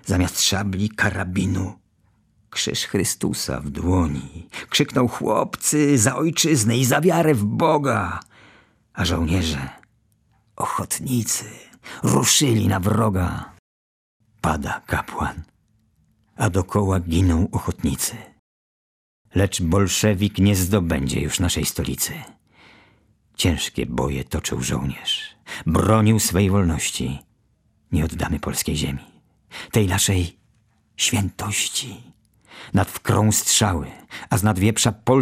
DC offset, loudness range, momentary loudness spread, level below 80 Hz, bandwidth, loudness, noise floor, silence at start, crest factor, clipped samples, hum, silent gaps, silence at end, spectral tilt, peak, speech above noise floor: under 0.1%; 6 LU; 12 LU; -42 dBFS; 15.5 kHz; -21 LUFS; -63 dBFS; 0.05 s; 20 dB; under 0.1%; none; 13.59-14.20 s, 18.39-19.25 s; 0 s; -4.5 dB/octave; -2 dBFS; 42 dB